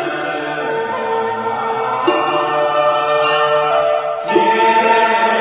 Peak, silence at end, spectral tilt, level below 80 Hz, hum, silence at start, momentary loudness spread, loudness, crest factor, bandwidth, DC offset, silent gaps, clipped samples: 0 dBFS; 0 s; -8 dB/octave; -58 dBFS; none; 0 s; 8 LU; -15 LUFS; 14 dB; 4 kHz; under 0.1%; none; under 0.1%